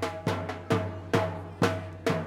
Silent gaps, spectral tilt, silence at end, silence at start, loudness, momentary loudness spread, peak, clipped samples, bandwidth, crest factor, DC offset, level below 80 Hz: none; -6 dB/octave; 0 s; 0 s; -30 LUFS; 4 LU; -12 dBFS; under 0.1%; 16.5 kHz; 18 dB; under 0.1%; -60 dBFS